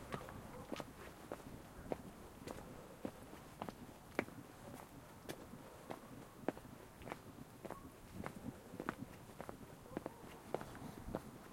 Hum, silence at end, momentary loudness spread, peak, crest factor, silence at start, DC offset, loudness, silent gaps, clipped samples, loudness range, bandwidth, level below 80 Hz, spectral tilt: none; 0 s; 8 LU; -20 dBFS; 32 dB; 0 s; under 0.1%; -51 LUFS; none; under 0.1%; 2 LU; 16.5 kHz; -66 dBFS; -5.5 dB/octave